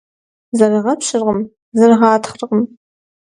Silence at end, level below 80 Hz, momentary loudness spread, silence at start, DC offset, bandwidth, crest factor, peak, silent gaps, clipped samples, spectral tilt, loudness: 0.6 s; -58 dBFS; 11 LU; 0.55 s; under 0.1%; 11 kHz; 16 dB; 0 dBFS; 1.62-1.72 s; under 0.1%; -5 dB/octave; -15 LUFS